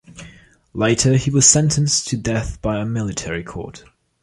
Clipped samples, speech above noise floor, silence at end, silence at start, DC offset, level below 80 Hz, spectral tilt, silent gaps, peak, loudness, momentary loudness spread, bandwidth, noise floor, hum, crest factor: under 0.1%; 27 dB; 0.45 s; 0.1 s; under 0.1%; -40 dBFS; -4 dB/octave; none; 0 dBFS; -17 LUFS; 19 LU; 11.5 kHz; -45 dBFS; none; 20 dB